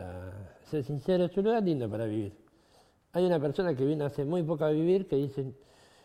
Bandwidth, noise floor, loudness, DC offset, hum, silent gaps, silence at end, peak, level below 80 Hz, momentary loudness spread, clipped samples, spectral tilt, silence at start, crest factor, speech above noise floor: 13.5 kHz; -64 dBFS; -30 LUFS; under 0.1%; none; none; 0.5 s; -14 dBFS; -62 dBFS; 14 LU; under 0.1%; -8.5 dB/octave; 0 s; 16 dB; 35 dB